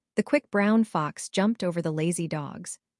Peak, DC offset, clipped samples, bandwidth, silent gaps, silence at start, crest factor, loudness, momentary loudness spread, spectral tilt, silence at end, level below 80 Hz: -10 dBFS; under 0.1%; under 0.1%; 12 kHz; none; 0.15 s; 16 dB; -27 LUFS; 10 LU; -5.5 dB/octave; 0.25 s; -72 dBFS